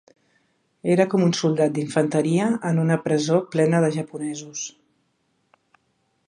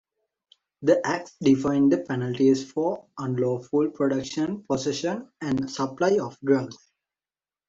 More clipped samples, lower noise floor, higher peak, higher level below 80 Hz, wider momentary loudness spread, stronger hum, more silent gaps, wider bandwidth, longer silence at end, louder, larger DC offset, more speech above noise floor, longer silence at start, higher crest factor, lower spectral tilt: neither; second, -69 dBFS vs under -90 dBFS; about the same, -4 dBFS vs -6 dBFS; second, -70 dBFS vs -64 dBFS; first, 11 LU vs 7 LU; neither; neither; first, 10.5 kHz vs 7.8 kHz; first, 1.6 s vs 0.95 s; first, -22 LUFS vs -25 LUFS; neither; second, 48 dB vs over 66 dB; about the same, 0.85 s vs 0.8 s; about the same, 18 dB vs 18 dB; about the same, -6 dB/octave vs -6 dB/octave